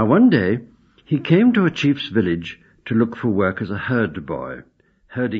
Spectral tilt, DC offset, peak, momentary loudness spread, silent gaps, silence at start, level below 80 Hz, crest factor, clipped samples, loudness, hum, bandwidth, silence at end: -8 dB/octave; under 0.1%; -2 dBFS; 16 LU; none; 0 s; -56 dBFS; 18 dB; under 0.1%; -19 LUFS; none; 7 kHz; 0 s